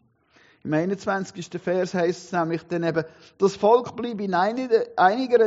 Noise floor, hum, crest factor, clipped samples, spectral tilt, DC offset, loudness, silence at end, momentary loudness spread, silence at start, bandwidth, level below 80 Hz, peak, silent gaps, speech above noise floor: -59 dBFS; none; 20 dB; under 0.1%; -5 dB/octave; under 0.1%; -24 LUFS; 0 s; 11 LU; 0.65 s; 8 kHz; -68 dBFS; -4 dBFS; none; 36 dB